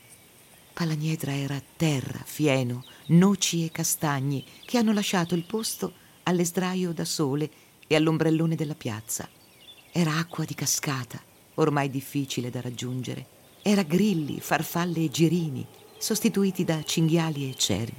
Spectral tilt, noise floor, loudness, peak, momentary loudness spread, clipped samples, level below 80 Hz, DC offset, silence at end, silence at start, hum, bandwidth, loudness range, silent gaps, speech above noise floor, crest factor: -5 dB/octave; -54 dBFS; -27 LUFS; -10 dBFS; 10 LU; under 0.1%; -64 dBFS; under 0.1%; 0 s; 0.1 s; none; 17 kHz; 4 LU; none; 28 dB; 18 dB